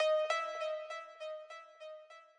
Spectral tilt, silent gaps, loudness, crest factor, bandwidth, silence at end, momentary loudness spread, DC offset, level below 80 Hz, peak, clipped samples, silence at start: 3 dB/octave; none; -38 LUFS; 16 dB; 10.5 kHz; 0.15 s; 19 LU; under 0.1%; under -90 dBFS; -22 dBFS; under 0.1%; 0 s